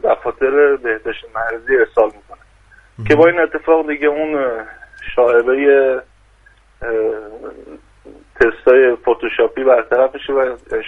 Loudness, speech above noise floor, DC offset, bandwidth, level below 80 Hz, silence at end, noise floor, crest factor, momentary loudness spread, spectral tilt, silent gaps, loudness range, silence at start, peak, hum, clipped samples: -15 LUFS; 35 dB; under 0.1%; 6.6 kHz; -44 dBFS; 0 s; -49 dBFS; 16 dB; 14 LU; -7 dB/octave; none; 3 LU; 0.05 s; 0 dBFS; none; under 0.1%